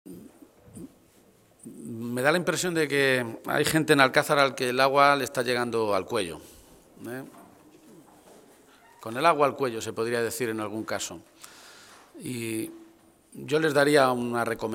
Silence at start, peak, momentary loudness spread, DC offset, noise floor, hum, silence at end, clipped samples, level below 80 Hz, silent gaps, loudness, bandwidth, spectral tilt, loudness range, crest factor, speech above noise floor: 0.05 s; -2 dBFS; 23 LU; under 0.1%; -59 dBFS; none; 0 s; under 0.1%; -66 dBFS; none; -25 LUFS; 17 kHz; -4 dB/octave; 10 LU; 26 dB; 34 dB